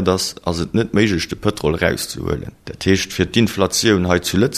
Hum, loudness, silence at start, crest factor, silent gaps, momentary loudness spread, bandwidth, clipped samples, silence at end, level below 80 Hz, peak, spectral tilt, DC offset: none; -18 LUFS; 0 s; 18 dB; none; 8 LU; 14 kHz; under 0.1%; 0 s; -38 dBFS; 0 dBFS; -4.5 dB/octave; under 0.1%